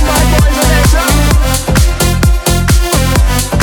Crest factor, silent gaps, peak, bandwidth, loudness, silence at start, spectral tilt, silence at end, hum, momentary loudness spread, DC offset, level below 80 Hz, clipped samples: 8 dB; none; 0 dBFS; 19.5 kHz; -10 LUFS; 0 s; -4.5 dB/octave; 0 s; none; 2 LU; under 0.1%; -12 dBFS; under 0.1%